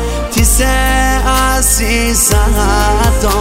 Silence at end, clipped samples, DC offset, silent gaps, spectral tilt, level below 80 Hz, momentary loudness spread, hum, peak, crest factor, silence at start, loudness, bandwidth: 0 s; under 0.1%; under 0.1%; none; -3.5 dB/octave; -14 dBFS; 2 LU; none; 0 dBFS; 10 dB; 0 s; -11 LUFS; 16.5 kHz